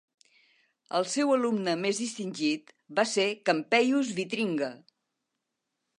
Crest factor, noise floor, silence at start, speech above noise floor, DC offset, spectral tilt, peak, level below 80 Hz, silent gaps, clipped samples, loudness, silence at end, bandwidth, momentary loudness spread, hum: 20 dB; -84 dBFS; 0.9 s; 56 dB; under 0.1%; -3.5 dB/octave; -8 dBFS; -84 dBFS; none; under 0.1%; -28 LUFS; 1.25 s; 11 kHz; 9 LU; none